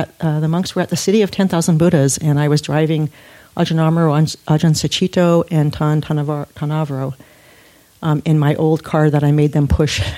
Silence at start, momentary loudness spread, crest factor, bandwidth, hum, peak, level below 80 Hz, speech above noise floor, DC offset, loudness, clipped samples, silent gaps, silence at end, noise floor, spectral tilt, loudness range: 0 s; 7 LU; 14 dB; 14.5 kHz; none; -2 dBFS; -36 dBFS; 33 dB; under 0.1%; -16 LUFS; under 0.1%; none; 0 s; -48 dBFS; -6 dB/octave; 3 LU